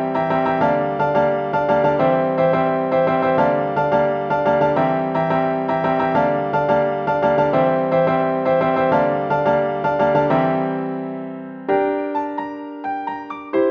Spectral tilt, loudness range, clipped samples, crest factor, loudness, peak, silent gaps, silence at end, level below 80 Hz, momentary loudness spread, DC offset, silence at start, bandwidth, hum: -8.5 dB/octave; 3 LU; under 0.1%; 14 dB; -19 LUFS; -6 dBFS; none; 0 s; -52 dBFS; 9 LU; under 0.1%; 0 s; 6.6 kHz; none